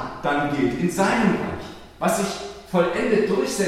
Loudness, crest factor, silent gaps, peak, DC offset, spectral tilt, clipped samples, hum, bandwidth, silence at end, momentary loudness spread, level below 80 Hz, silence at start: -22 LUFS; 16 dB; none; -6 dBFS; under 0.1%; -5 dB/octave; under 0.1%; none; 16 kHz; 0 s; 10 LU; -48 dBFS; 0 s